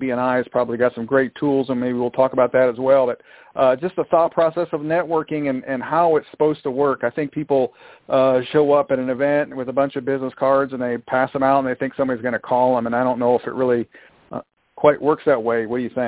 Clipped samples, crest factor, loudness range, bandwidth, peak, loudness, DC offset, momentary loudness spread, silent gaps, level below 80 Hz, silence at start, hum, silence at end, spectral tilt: under 0.1%; 18 dB; 2 LU; 4 kHz; -2 dBFS; -20 LUFS; under 0.1%; 7 LU; none; -60 dBFS; 0 s; none; 0 s; -10.5 dB/octave